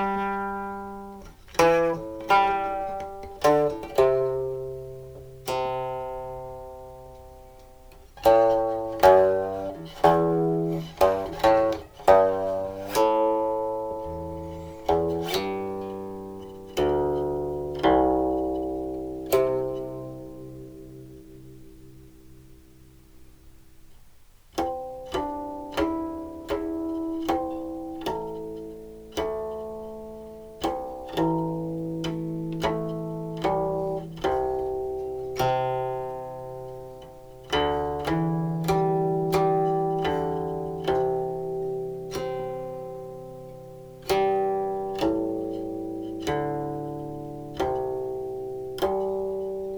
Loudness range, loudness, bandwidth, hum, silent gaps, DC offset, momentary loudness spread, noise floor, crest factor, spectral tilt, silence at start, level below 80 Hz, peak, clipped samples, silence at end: 10 LU; -26 LUFS; over 20 kHz; none; none; under 0.1%; 18 LU; -51 dBFS; 24 dB; -6 dB/octave; 0 s; -48 dBFS; -2 dBFS; under 0.1%; 0 s